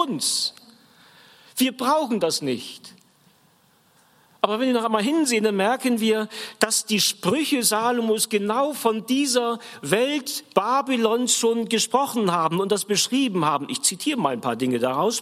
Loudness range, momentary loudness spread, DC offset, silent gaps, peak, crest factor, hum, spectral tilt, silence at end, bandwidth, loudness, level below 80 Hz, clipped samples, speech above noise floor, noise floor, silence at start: 5 LU; 5 LU; under 0.1%; none; 0 dBFS; 22 dB; none; -3 dB/octave; 0 s; 16 kHz; -22 LUFS; -74 dBFS; under 0.1%; 37 dB; -60 dBFS; 0 s